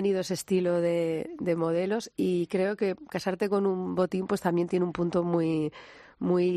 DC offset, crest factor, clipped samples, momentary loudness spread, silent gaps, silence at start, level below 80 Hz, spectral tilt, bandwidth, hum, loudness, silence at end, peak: under 0.1%; 16 dB; under 0.1%; 5 LU; none; 0 s; -66 dBFS; -6.5 dB/octave; 14 kHz; none; -28 LUFS; 0 s; -10 dBFS